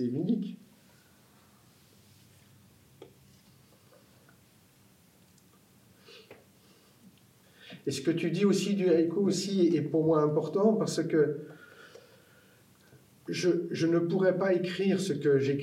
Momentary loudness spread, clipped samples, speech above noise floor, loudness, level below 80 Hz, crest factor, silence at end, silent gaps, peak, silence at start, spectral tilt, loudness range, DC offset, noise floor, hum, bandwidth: 15 LU; under 0.1%; 34 dB; -28 LUFS; -82 dBFS; 18 dB; 0 s; none; -12 dBFS; 0 s; -6 dB/octave; 11 LU; under 0.1%; -62 dBFS; none; 16 kHz